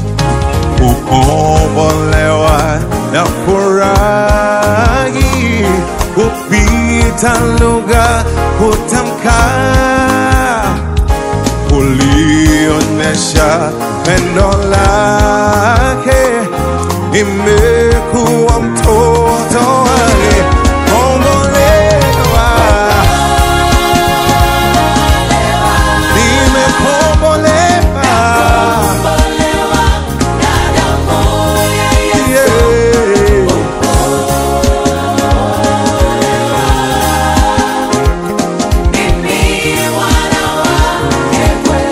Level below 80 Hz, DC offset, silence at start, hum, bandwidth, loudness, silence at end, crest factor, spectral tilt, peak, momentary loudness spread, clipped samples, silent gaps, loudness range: -16 dBFS; 0.2%; 0 s; none; 16.5 kHz; -10 LUFS; 0 s; 10 dB; -5 dB/octave; 0 dBFS; 4 LU; 0.7%; none; 2 LU